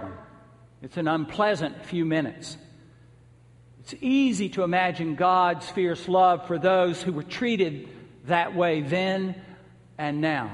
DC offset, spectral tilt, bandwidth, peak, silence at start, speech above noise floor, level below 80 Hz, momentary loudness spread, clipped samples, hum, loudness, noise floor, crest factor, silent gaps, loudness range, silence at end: under 0.1%; -6 dB/octave; 11.5 kHz; -6 dBFS; 0 s; 29 dB; -62 dBFS; 19 LU; under 0.1%; none; -25 LUFS; -54 dBFS; 20 dB; none; 6 LU; 0 s